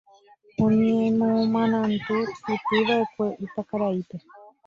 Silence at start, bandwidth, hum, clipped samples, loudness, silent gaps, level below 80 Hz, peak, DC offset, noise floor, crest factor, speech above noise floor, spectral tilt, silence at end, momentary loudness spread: 0.6 s; 7 kHz; none; under 0.1%; -24 LUFS; none; -60 dBFS; -10 dBFS; under 0.1%; -55 dBFS; 14 dB; 32 dB; -7.5 dB/octave; 0.2 s; 11 LU